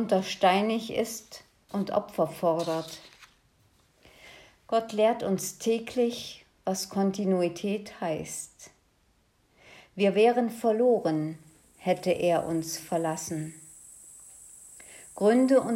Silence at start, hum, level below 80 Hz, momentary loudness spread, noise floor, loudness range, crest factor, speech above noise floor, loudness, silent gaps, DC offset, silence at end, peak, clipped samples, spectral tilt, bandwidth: 0 s; none; -68 dBFS; 23 LU; -67 dBFS; 5 LU; 18 dB; 40 dB; -28 LUFS; none; under 0.1%; 0 s; -10 dBFS; under 0.1%; -5 dB/octave; 16 kHz